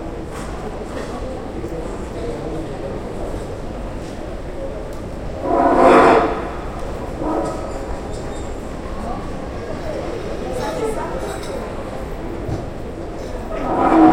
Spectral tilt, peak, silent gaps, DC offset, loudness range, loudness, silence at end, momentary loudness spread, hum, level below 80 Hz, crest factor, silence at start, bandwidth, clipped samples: -6.5 dB/octave; 0 dBFS; none; under 0.1%; 11 LU; -22 LUFS; 0 s; 14 LU; none; -32 dBFS; 20 dB; 0 s; 16 kHz; under 0.1%